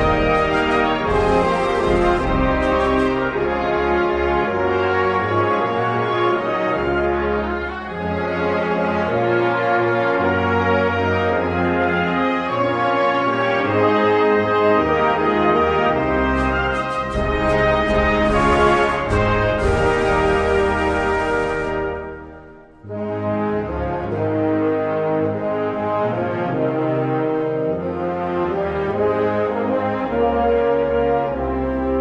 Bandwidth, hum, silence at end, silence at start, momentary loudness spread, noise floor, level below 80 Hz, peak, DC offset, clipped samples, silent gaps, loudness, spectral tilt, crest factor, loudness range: 10.5 kHz; none; 0 s; 0 s; 6 LU; -41 dBFS; -34 dBFS; -4 dBFS; under 0.1%; under 0.1%; none; -19 LUFS; -7 dB/octave; 14 dB; 4 LU